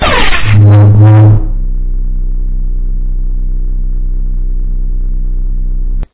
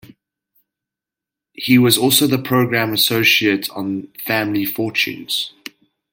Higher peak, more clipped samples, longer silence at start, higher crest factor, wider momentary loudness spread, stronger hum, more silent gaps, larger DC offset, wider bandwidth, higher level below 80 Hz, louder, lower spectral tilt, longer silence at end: about the same, 0 dBFS vs 0 dBFS; first, 2% vs under 0.1%; second, 0 s vs 1.6 s; second, 8 dB vs 18 dB; about the same, 15 LU vs 14 LU; neither; neither; neither; second, 4 kHz vs 17 kHz; first, -12 dBFS vs -60 dBFS; first, -11 LUFS vs -16 LUFS; first, -10.5 dB/octave vs -3.5 dB/octave; second, 0 s vs 0.65 s